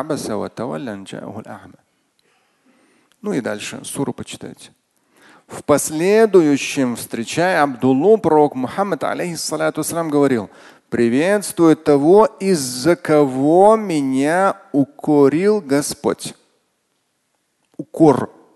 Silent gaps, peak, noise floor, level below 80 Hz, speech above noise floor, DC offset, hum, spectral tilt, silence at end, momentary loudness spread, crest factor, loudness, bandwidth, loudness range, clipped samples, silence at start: none; 0 dBFS; -68 dBFS; -58 dBFS; 52 dB; under 0.1%; none; -5.5 dB/octave; 0.3 s; 18 LU; 18 dB; -17 LUFS; 12.5 kHz; 14 LU; under 0.1%; 0 s